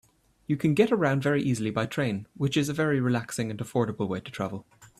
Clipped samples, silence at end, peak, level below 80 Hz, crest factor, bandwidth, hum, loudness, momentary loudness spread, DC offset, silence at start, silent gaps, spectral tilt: under 0.1%; 0.15 s; -10 dBFS; -62 dBFS; 18 dB; 14 kHz; none; -27 LUFS; 10 LU; under 0.1%; 0.5 s; none; -6 dB/octave